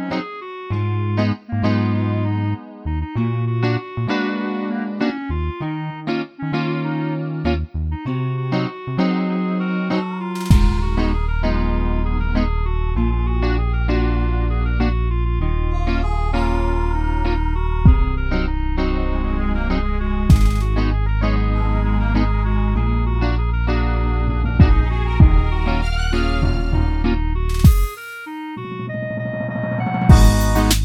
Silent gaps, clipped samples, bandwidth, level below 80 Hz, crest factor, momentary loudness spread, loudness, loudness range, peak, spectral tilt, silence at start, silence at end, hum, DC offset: none; under 0.1%; 15.5 kHz; -20 dBFS; 18 dB; 9 LU; -20 LUFS; 5 LU; 0 dBFS; -7 dB/octave; 0 s; 0 s; none; under 0.1%